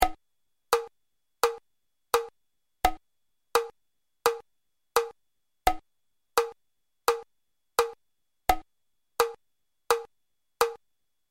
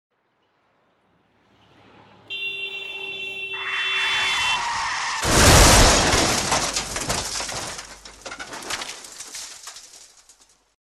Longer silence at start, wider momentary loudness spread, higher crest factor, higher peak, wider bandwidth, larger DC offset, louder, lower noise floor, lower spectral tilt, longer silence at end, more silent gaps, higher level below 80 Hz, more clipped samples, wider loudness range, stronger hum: second, 0 s vs 2.3 s; second, 11 LU vs 22 LU; about the same, 26 dB vs 22 dB; about the same, -4 dBFS vs -2 dBFS; about the same, 16.5 kHz vs 16 kHz; neither; second, -30 LUFS vs -19 LUFS; first, -83 dBFS vs -67 dBFS; about the same, -2 dB/octave vs -2.5 dB/octave; second, 0.55 s vs 0.95 s; neither; second, -48 dBFS vs -32 dBFS; neither; second, 1 LU vs 16 LU; neither